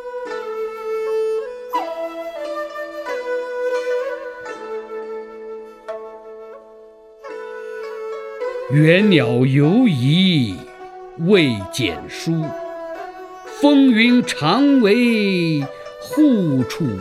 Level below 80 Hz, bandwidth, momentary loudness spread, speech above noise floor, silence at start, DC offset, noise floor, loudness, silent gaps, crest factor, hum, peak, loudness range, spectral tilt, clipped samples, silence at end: -58 dBFS; 14 kHz; 20 LU; 28 dB; 0 s; under 0.1%; -43 dBFS; -18 LUFS; none; 18 dB; none; 0 dBFS; 16 LU; -6.5 dB/octave; under 0.1%; 0 s